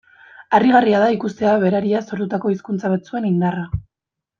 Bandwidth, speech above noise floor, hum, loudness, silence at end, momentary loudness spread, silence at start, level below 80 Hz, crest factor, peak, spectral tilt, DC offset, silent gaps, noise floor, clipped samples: 7.2 kHz; 67 dB; none; -18 LUFS; 0.6 s; 10 LU; 0.4 s; -44 dBFS; 18 dB; -2 dBFS; -8 dB/octave; under 0.1%; none; -85 dBFS; under 0.1%